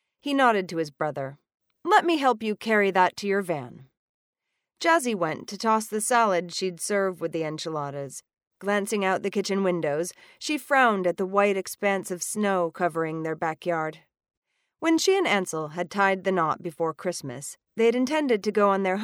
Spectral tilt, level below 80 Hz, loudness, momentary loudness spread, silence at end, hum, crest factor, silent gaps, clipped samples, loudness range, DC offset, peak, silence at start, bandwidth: -4 dB/octave; -78 dBFS; -25 LUFS; 10 LU; 0 s; none; 20 dB; 3.97-4.33 s, 8.47-8.51 s, 14.37-14.42 s; under 0.1%; 3 LU; under 0.1%; -6 dBFS; 0.25 s; 17.5 kHz